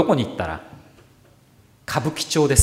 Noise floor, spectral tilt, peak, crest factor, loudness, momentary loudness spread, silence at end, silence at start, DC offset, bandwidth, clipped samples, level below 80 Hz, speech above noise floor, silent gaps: -54 dBFS; -4.5 dB/octave; 0 dBFS; 22 dB; -23 LUFS; 18 LU; 0 s; 0 s; under 0.1%; 16 kHz; under 0.1%; -50 dBFS; 34 dB; none